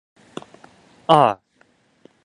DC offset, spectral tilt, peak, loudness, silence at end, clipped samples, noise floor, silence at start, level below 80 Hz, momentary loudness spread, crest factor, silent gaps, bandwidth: under 0.1%; -6 dB/octave; 0 dBFS; -17 LUFS; 0.9 s; under 0.1%; -60 dBFS; 1.1 s; -66 dBFS; 24 LU; 22 dB; none; 11 kHz